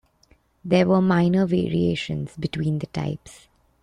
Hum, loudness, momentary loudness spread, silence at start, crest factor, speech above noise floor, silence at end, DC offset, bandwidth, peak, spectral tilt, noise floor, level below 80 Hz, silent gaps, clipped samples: none; -22 LUFS; 11 LU; 0.65 s; 16 dB; 38 dB; 0.5 s; under 0.1%; 10 kHz; -6 dBFS; -7.5 dB/octave; -60 dBFS; -52 dBFS; none; under 0.1%